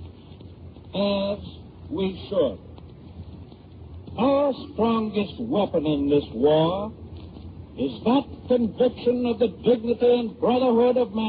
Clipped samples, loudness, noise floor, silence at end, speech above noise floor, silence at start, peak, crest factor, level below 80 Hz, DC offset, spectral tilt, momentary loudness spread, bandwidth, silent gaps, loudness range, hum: under 0.1%; -23 LUFS; -44 dBFS; 0 s; 21 dB; 0 s; -8 dBFS; 16 dB; -50 dBFS; under 0.1%; -5.5 dB/octave; 22 LU; 4.9 kHz; none; 7 LU; none